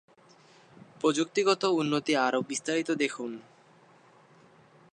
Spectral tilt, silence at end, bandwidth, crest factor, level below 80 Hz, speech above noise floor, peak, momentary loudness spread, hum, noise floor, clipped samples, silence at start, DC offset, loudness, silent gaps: -4 dB/octave; 1.5 s; 10.5 kHz; 20 dB; -80 dBFS; 31 dB; -12 dBFS; 8 LU; none; -59 dBFS; under 0.1%; 1 s; under 0.1%; -28 LUFS; none